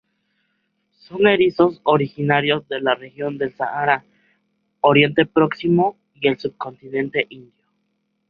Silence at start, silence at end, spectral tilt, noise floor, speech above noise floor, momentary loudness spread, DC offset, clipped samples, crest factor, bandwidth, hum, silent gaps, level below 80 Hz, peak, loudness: 1.1 s; 0.9 s; -8.5 dB/octave; -71 dBFS; 52 dB; 11 LU; under 0.1%; under 0.1%; 18 dB; 5.4 kHz; none; none; -60 dBFS; -2 dBFS; -19 LUFS